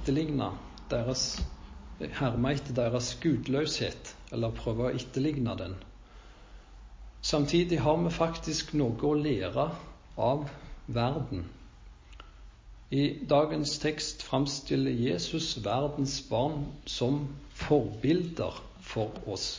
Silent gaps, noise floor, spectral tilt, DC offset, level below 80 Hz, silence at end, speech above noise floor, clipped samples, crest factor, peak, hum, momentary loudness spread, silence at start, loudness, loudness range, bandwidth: none; -51 dBFS; -5.5 dB/octave; under 0.1%; -48 dBFS; 0 s; 21 dB; under 0.1%; 20 dB; -12 dBFS; none; 13 LU; 0 s; -31 LUFS; 5 LU; 7.6 kHz